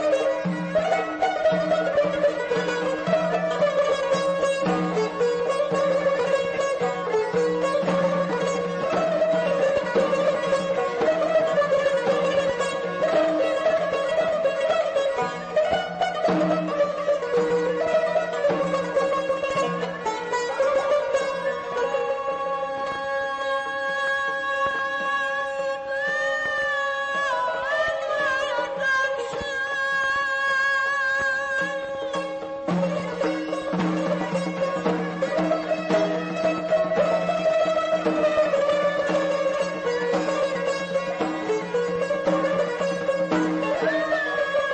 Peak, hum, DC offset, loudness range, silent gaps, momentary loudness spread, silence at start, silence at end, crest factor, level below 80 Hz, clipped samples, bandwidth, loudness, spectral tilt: -10 dBFS; none; under 0.1%; 3 LU; none; 5 LU; 0 s; 0 s; 14 dB; -60 dBFS; under 0.1%; 8.8 kHz; -24 LUFS; -5 dB/octave